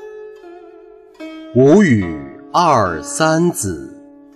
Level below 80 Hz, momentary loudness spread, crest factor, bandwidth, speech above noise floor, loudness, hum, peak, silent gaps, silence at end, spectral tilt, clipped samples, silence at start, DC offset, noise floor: -48 dBFS; 24 LU; 14 dB; 14 kHz; 28 dB; -14 LUFS; none; -2 dBFS; none; 0.4 s; -5.5 dB/octave; under 0.1%; 0 s; under 0.1%; -42 dBFS